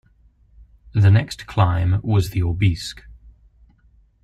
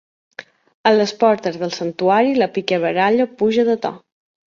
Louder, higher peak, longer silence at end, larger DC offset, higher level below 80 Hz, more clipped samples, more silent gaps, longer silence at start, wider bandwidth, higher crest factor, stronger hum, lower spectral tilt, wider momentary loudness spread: second, -20 LUFS vs -17 LUFS; about the same, -4 dBFS vs -2 dBFS; first, 1.1 s vs 0.55 s; neither; first, -40 dBFS vs -62 dBFS; neither; second, none vs 0.74-0.84 s; first, 0.95 s vs 0.4 s; first, 13 kHz vs 7.4 kHz; about the same, 16 dB vs 16 dB; neither; first, -7 dB/octave vs -5.5 dB/octave; second, 12 LU vs 15 LU